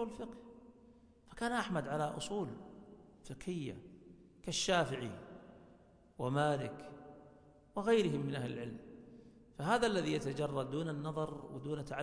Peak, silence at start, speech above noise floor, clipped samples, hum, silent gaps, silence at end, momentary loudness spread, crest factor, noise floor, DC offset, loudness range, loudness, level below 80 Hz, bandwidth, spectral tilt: -18 dBFS; 0 s; 26 dB; under 0.1%; none; none; 0 s; 24 LU; 20 dB; -64 dBFS; under 0.1%; 5 LU; -38 LUFS; -64 dBFS; 10.5 kHz; -5 dB/octave